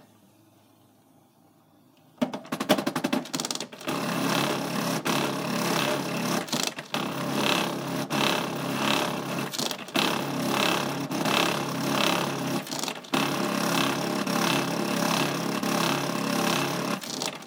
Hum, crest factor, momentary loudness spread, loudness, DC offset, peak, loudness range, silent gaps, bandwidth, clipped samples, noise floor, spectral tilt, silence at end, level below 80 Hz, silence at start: none; 22 dB; 6 LU; -27 LUFS; under 0.1%; -6 dBFS; 3 LU; none; 19 kHz; under 0.1%; -60 dBFS; -3.5 dB/octave; 0 s; -72 dBFS; 2.2 s